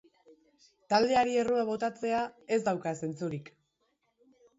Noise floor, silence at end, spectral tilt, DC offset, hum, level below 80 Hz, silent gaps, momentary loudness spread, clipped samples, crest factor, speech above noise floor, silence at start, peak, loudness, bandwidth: -77 dBFS; 1.15 s; -5 dB/octave; under 0.1%; none; -70 dBFS; none; 10 LU; under 0.1%; 20 dB; 47 dB; 0.9 s; -12 dBFS; -30 LUFS; 8 kHz